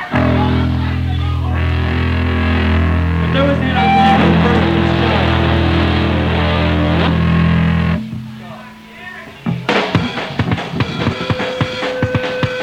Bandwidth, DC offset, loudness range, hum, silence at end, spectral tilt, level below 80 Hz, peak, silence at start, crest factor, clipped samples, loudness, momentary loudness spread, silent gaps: 8.2 kHz; under 0.1%; 6 LU; none; 0 s; -7.5 dB/octave; -26 dBFS; 0 dBFS; 0 s; 14 dB; under 0.1%; -15 LUFS; 10 LU; none